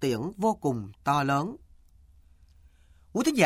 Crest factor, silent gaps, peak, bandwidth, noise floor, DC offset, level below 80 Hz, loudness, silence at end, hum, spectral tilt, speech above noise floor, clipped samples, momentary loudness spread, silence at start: 22 dB; none; -8 dBFS; 16 kHz; -57 dBFS; under 0.1%; -58 dBFS; -29 LUFS; 0 s; none; -5.5 dB/octave; 30 dB; under 0.1%; 10 LU; 0 s